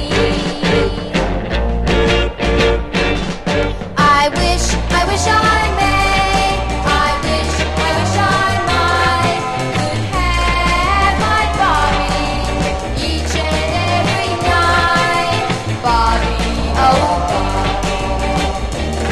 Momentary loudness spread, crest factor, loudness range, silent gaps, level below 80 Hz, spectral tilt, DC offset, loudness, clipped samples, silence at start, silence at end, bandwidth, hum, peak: 6 LU; 14 dB; 2 LU; none; -22 dBFS; -4.5 dB/octave; 0.8%; -15 LUFS; under 0.1%; 0 s; 0 s; 13 kHz; none; -2 dBFS